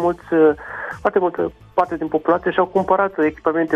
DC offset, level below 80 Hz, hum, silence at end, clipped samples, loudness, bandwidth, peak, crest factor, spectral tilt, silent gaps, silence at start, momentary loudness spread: under 0.1%; -50 dBFS; none; 0 s; under 0.1%; -19 LUFS; 7.4 kHz; -4 dBFS; 14 dB; -8 dB/octave; none; 0 s; 7 LU